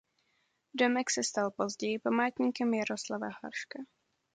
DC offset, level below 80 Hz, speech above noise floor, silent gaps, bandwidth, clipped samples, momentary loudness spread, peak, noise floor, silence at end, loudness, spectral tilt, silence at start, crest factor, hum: under 0.1%; -78 dBFS; 44 dB; none; 9.4 kHz; under 0.1%; 13 LU; -14 dBFS; -76 dBFS; 0.5 s; -32 LUFS; -3 dB/octave; 0.75 s; 20 dB; none